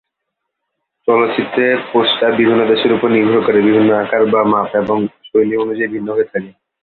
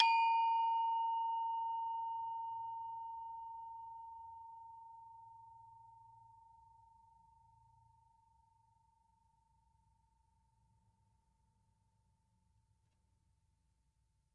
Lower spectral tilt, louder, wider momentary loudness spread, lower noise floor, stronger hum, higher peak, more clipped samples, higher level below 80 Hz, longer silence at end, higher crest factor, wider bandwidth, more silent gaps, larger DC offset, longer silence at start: first, -9 dB/octave vs -1 dB/octave; first, -14 LUFS vs -39 LUFS; second, 6 LU vs 25 LU; second, -76 dBFS vs -80 dBFS; neither; first, -2 dBFS vs -16 dBFS; neither; first, -56 dBFS vs -82 dBFS; second, 0.35 s vs 8.15 s; second, 12 dB vs 28 dB; second, 4.5 kHz vs 7.8 kHz; neither; neither; first, 1.05 s vs 0 s